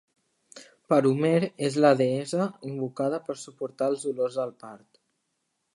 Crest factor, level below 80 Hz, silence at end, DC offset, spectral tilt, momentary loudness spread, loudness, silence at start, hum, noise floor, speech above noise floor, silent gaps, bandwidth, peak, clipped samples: 20 dB; -78 dBFS; 1 s; under 0.1%; -6.5 dB/octave; 14 LU; -26 LUFS; 0.55 s; none; -78 dBFS; 52 dB; none; 11.5 kHz; -6 dBFS; under 0.1%